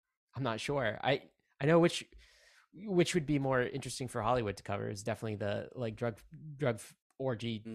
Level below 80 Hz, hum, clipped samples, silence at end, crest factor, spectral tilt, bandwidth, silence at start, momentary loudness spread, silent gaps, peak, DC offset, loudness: -62 dBFS; none; under 0.1%; 0 s; 18 dB; -5.5 dB/octave; 14 kHz; 0.35 s; 11 LU; 7.01-7.10 s; -16 dBFS; under 0.1%; -34 LUFS